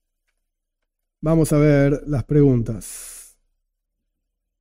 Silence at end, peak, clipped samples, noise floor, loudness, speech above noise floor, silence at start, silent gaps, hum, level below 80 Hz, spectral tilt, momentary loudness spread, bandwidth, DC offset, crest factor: 1.4 s; -6 dBFS; under 0.1%; -78 dBFS; -18 LUFS; 61 dB; 1.2 s; none; none; -38 dBFS; -7.5 dB/octave; 17 LU; 16 kHz; under 0.1%; 16 dB